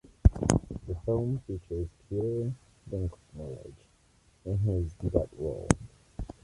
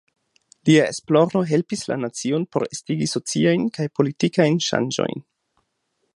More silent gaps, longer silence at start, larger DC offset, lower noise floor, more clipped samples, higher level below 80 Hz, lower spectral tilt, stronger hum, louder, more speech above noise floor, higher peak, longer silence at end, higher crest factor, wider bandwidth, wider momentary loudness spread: neither; second, 0.25 s vs 0.65 s; neither; second, -64 dBFS vs -73 dBFS; neither; first, -38 dBFS vs -64 dBFS; first, -7 dB/octave vs -5.5 dB/octave; neither; second, -32 LUFS vs -21 LUFS; second, 32 dB vs 53 dB; about the same, -2 dBFS vs -2 dBFS; second, 0.15 s vs 0.95 s; first, 28 dB vs 20 dB; about the same, 11.5 kHz vs 11.5 kHz; first, 16 LU vs 8 LU